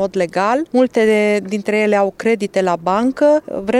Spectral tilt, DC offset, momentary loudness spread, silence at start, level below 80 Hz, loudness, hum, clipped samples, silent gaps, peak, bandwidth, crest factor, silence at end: -5.5 dB/octave; under 0.1%; 4 LU; 0 s; -54 dBFS; -16 LUFS; none; under 0.1%; none; -4 dBFS; 13 kHz; 12 dB; 0 s